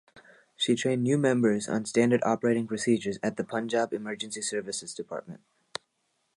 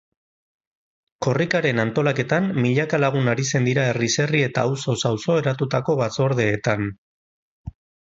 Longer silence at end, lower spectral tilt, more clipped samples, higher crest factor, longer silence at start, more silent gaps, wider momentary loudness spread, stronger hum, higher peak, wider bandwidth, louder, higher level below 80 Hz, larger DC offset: first, 1 s vs 0.4 s; about the same, -5 dB/octave vs -5.5 dB/octave; neither; about the same, 18 dB vs 18 dB; second, 0.15 s vs 1.2 s; second, none vs 6.98-7.64 s; first, 15 LU vs 6 LU; neither; second, -10 dBFS vs -4 dBFS; first, 11 kHz vs 8 kHz; second, -28 LUFS vs -21 LUFS; second, -70 dBFS vs -54 dBFS; neither